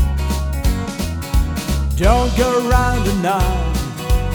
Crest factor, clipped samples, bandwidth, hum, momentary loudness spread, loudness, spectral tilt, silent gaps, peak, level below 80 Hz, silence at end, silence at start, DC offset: 16 dB; under 0.1%; over 20 kHz; none; 7 LU; -18 LUFS; -5.5 dB/octave; none; 0 dBFS; -20 dBFS; 0 s; 0 s; under 0.1%